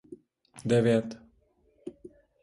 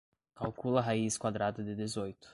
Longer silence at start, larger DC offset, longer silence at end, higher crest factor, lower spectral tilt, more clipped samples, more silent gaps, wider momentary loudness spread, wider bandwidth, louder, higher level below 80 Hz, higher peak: second, 0.1 s vs 0.35 s; neither; first, 0.5 s vs 0 s; about the same, 20 dB vs 20 dB; first, -7 dB/octave vs -5 dB/octave; neither; neither; first, 23 LU vs 9 LU; about the same, 11.5 kHz vs 11.5 kHz; first, -27 LUFS vs -35 LUFS; about the same, -64 dBFS vs -64 dBFS; about the same, -12 dBFS vs -14 dBFS